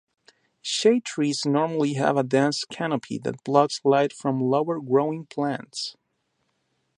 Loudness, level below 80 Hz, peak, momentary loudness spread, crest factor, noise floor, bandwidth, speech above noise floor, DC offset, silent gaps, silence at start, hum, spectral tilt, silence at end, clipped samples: -24 LUFS; -72 dBFS; -4 dBFS; 9 LU; 22 dB; -74 dBFS; 11.5 kHz; 50 dB; under 0.1%; none; 0.65 s; none; -5 dB/octave; 1.05 s; under 0.1%